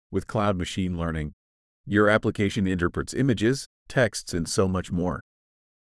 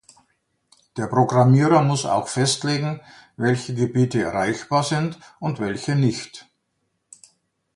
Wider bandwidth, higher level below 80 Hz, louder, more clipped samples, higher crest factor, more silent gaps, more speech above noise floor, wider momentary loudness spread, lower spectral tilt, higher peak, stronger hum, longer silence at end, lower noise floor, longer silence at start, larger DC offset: about the same, 12 kHz vs 11.5 kHz; first, -48 dBFS vs -58 dBFS; second, -25 LUFS vs -21 LUFS; neither; about the same, 20 dB vs 20 dB; first, 1.33-1.84 s, 3.66-3.86 s vs none; first, over 65 dB vs 53 dB; second, 9 LU vs 14 LU; about the same, -5.5 dB/octave vs -5.5 dB/octave; second, -6 dBFS vs -2 dBFS; neither; second, 0.65 s vs 1.35 s; first, under -90 dBFS vs -73 dBFS; second, 0.1 s vs 0.95 s; neither